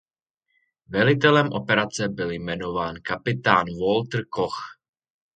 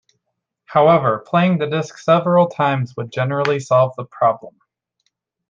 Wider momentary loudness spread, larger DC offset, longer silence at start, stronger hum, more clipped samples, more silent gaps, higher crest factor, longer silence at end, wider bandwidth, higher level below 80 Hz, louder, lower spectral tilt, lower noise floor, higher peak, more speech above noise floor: about the same, 11 LU vs 9 LU; neither; first, 0.9 s vs 0.7 s; neither; neither; neither; first, 24 dB vs 16 dB; second, 0.6 s vs 1 s; first, 9.2 kHz vs 7.6 kHz; first, -54 dBFS vs -62 dBFS; second, -23 LUFS vs -17 LUFS; second, -5.5 dB/octave vs -7 dB/octave; about the same, -79 dBFS vs -76 dBFS; about the same, 0 dBFS vs -2 dBFS; second, 56 dB vs 60 dB